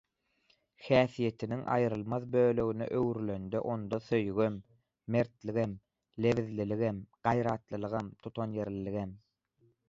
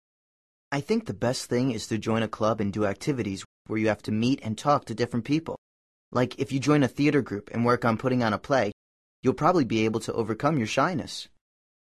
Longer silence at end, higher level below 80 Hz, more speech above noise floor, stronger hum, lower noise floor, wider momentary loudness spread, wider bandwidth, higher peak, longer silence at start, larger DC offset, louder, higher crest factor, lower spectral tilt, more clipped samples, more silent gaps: about the same, 0.7 s vs 0.7 s; second, -62 dBFS vs -56 dBFS; second, 41 dB vs over 64 dB; neither; second, -73 dBFS vs under -90 dBFS; about the same, 10 LU vs 9 LU; second, 7.6 kHz vs 13 kHz; second, -12 dBFS vs -8 dBFS; about the same, 0.8 s vs 0.7 s; neither; second, -33 LUFS vs -26 LUFS; about the same, 22 dB vs 20 dB; first, -8 dB/octave vs -6 dB/octave; neither; second, none vs 3.45-3.65 s, 5.58-6.12 s, 8.73-9.23 s